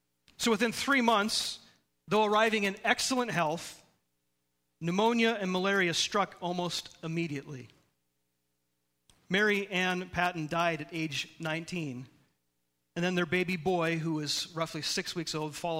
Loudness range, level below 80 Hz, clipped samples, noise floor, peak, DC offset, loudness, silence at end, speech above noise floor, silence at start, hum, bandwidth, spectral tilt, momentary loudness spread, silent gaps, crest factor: 6 LU; -66 dBFS; under 0.1%; -80 dBFS; -8 dBFS; under 0.1%; -30 LUFS; 0 s; 50 dB; 0.4 s; 60 Hz at -65 dBFS; 16 kHz; -4 dB/octave; 11 LU; none; 22 dB